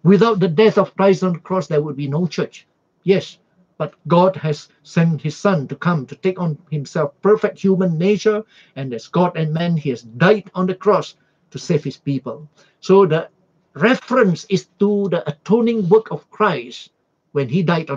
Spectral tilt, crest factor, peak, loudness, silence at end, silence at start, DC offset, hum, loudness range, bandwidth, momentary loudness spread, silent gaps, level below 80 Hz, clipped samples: -7 dB/octave; 18 dB; 0 dBFS; -18 LUFS; 0 s; 0.05 s; under 0.1%; none; 3 LU; 7.6 kHz; 14 LU; none; -64 dBFS; under 0.1%